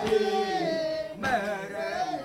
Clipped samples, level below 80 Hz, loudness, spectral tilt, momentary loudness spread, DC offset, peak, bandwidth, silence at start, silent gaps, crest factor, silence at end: under 0.1%; -58 dBFS; -29 LUFS; -4.5 dB/octave; 7 LU; under 0.1%; -14 dBFS; 16 kHz; 0 s; none; 16 dB; 0 s